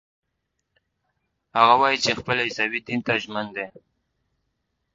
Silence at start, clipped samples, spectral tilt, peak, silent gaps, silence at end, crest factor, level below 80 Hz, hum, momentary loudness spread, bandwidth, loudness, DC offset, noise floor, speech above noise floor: 1.55 s; under 0.1%; -3.5 dB/octave; -2 dBFS; none; 1.25 s; 24 dB; -62 dBFS; none; 14 LU; 7.8 kHz; -22 LUFS; under 0.1%; -78 dBFS; 55 dB